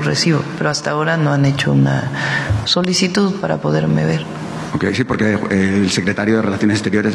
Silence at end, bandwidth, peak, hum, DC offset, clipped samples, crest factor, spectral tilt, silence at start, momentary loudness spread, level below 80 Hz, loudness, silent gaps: 0 s; 12 kHz; -2 dBFS; none; under 0.1%; under 0.1%; 14 dB; -5.5 dB/octave; 0 s; 4 LU; -46 dBFS; -16 LUFS; none